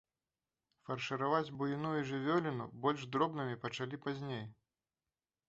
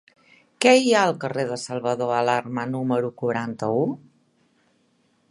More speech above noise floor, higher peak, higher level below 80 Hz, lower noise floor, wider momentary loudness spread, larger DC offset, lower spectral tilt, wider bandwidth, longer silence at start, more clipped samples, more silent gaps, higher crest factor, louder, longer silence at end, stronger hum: first, over 53 dB vs 43 dB; second, -18 dBFS vs -2 dBFS; second, -76 dBFS vs -70 dBFS; first, under -90 dBFS vs -65 dBFS; about the same, 9 LU vs 11 LU; neither; about the same, -5 dB/octave vs -4.5 dB/octave; second, 8 kHz vs 11.5 kHz; first, 0.9 s vs 0.6 s; neither; neither; about the same, 20 dB vs 22 dB; second, -38 LUFS vs -22 LUFS; second, 0.95 s vs 1.35 s; neither